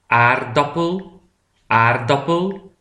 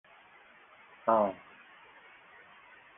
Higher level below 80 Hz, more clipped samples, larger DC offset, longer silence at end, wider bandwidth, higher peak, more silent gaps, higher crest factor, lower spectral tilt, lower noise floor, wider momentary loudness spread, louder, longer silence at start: first, -54 dBFS vs -78 dBFS; neither; neither; second, 0.15 s vs 1.65 s; first, 10 kHz vs 3.8 kHz; first, 0 dBFS vs -12 dBFS; neither; second, 18 dB vs 24 dB; second, -6.5 dB/octave vs -9 dB/octave; about the same, -60 dBFS vs -58 dBFS; second, 9 LU vs 27 LU; first, -17 LUFS vs -30 LUFS; second, 0.1 s vs 1.05 s